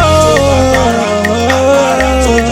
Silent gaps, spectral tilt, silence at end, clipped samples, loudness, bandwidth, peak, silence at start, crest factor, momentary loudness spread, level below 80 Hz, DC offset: none; -5 dB/octave; 0 s; under 0.1%; -9 LUFS; 16.5 kHz; 0 dBFS; 0 s; 8 dB; 3 LU; -22 dBFS; under 0.1%